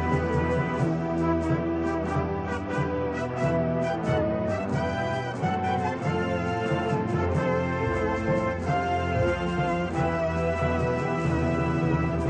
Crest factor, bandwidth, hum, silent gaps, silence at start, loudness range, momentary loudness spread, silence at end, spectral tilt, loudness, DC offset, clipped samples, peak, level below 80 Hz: 14 dB; 9.4 kHz; none; none; 0 s; 1 LU; 3 LU; 0 s; -7.5 dB/octave; -27 LUFS; under 0.1%; under 0.1%; -12 dBFS; -42 dBFS